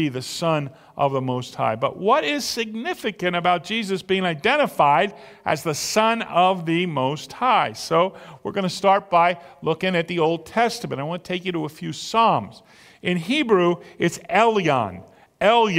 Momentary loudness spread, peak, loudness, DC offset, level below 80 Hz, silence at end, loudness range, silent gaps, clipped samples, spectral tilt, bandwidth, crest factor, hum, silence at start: 9 LU; -2 dBFS; -22 LUFS; under 0.1%; -62 dBFS; 0 s; 3 LU; none; under 0.1%; -4.5 dB/octave; 16 kHz; 18 dB; none; 0 s